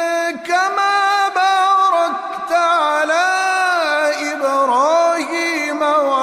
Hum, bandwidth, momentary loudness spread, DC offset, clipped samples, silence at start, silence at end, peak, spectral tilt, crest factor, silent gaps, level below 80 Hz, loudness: none; 14.5 kHz; 5 LU; under 0.1%; under 0.1%; 0 s; 0 s; -4 dBFS; -0.5 dB/octave; 10 dB; none; -70 dBFS; -16 LUFS